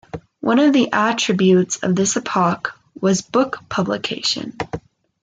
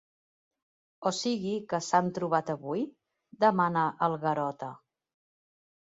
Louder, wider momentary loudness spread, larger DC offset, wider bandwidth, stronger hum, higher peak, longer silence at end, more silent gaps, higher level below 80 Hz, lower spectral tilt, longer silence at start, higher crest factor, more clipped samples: first, -18 LUFS vs -29 LUFS; first, 13 LU vs 9 LU; neither; first, 9.4 kHz vs 8.2 kHz; neither; first, -4 dBFS vs -10 dBFS; second, 0.45 s vs 1.2 s; neither; first, -56 dBFS vs -76 dBFS; about the same, -4.5 dB/octave vs -5 dB/octave; second, 0.15 s vs 1 s; second, 14 dB vs 20 dB; neither